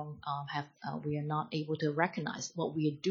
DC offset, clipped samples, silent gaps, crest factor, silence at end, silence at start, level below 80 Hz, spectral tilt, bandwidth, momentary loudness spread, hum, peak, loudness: under 0.1%; under 0.1%; none; 22 dB; 0 s; 0 s; -74 dBFS; -5.5 dB/octave; 7.6 kHz; 7 LU; none; -12 dBFS; -36 LUFS